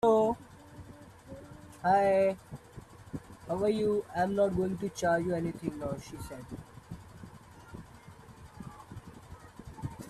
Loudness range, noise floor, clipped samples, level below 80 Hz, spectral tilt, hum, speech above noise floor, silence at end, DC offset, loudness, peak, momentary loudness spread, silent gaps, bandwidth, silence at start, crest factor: 18 LU; -52 dBFS; under 0.1%; -58 dBFS; -6.5 dB/octave; none; 22 dB; 0 s; under 0.1%; -31 LUFS; -14 dBFS; 24 LU; none; 14 kHz; 0.05 s; 18 dB